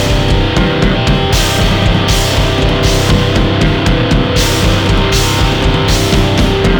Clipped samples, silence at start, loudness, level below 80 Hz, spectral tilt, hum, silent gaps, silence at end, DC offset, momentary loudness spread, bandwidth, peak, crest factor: under 0.1%; 0 s; -11 LUFS; -16 dBFS; -5 dB/octave; none; none; 0 s; under 0.1%; 1 LU; over 20 kHz; 0 dBFS; 10 dB